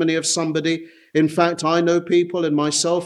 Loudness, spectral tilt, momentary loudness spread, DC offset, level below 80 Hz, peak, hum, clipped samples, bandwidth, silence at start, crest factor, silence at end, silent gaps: -19 LUFS; -4 dB/octave; 5 LU; under 0.1%; -66 dBFS; -2 dBFS; none; under 0.1%; 12.5 kHz; 0 s; 16 dB; 0 s; none